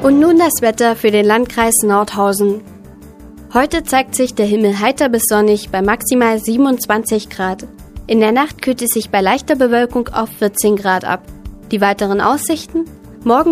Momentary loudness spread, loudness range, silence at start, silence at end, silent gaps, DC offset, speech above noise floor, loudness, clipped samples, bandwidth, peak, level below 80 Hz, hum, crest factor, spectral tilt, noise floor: 9 LU; 2 LU; 0 s; 0 s; none; under 0.1%; 23 dB; -14 LUFS; under 0.1%; 15.5 kHz; 0 dBFS; -40 dBFS; none; 14 dB; -4 dB/octave; -37 dBFS